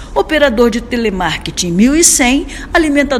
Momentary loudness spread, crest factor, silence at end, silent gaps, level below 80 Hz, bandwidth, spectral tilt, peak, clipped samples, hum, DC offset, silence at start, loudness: 9 LU; 12 dB; 0 s; none; -30 dBFS; over 20 kHz; -3 dB/octave; 0 dBFS; 0.3%; none; under 0.1%; 0 s; -11 LUFS